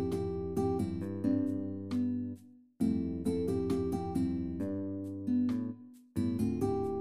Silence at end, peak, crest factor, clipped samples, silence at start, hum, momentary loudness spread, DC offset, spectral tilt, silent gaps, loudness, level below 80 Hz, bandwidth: 0 s; -20 dBFS; 14 dB; under 0.1%; 0 s; none; 7 LU; 0.2%; -8.5 dB/octave; none; -34 LUFS; -56 dBFS; 14.5 kHz